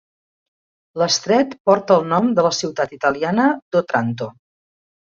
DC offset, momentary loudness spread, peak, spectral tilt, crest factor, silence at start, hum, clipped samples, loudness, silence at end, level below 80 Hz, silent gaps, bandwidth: under 0.1%; 9 LU; -2 dBFS; -4.5 dB/octave; 18 dB; 0.95 s; none; under 0.1%; -18 LUFS; 0.7 s; -60 dBFS; 1.60-1.65 s, 3.62-3.71 s; 7.6 kHz